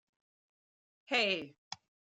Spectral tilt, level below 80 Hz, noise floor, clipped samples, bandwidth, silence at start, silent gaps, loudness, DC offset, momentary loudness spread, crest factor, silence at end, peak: -2.5 dB/octave; -86 dBFS; under -90 dBFS; under 0.1%; 13.5 kHz; 1.1 s; 1.58-1.71 s; -32 LUFS; under 0.1%; 18 LU; 22 dB; 0.45 s; -18 dBFS